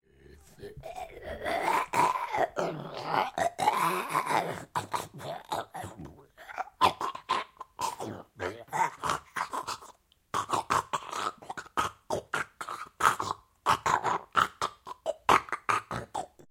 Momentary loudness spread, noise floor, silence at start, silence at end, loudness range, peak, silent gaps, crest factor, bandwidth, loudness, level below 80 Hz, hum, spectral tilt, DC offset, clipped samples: 15 LU; -57 dBFS; 0.3 s; 0.1 s; 5 LU; -6 dBFS; none; 26 dB; 16.5 kHz; -31 LUFS; -60 dBFS; none; -3 dB/octave; under 0.1%; under 0.1%